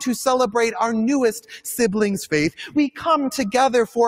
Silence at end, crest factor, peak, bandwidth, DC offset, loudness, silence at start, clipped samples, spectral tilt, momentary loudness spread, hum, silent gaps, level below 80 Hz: 0 s; 14 dB; -6 dBFS; 16 kHz; under 0.1%; -20 LUFS; 0 s; under 0.1%; -4.5 dB/octave; 4 LU; none; none; -56 dBFS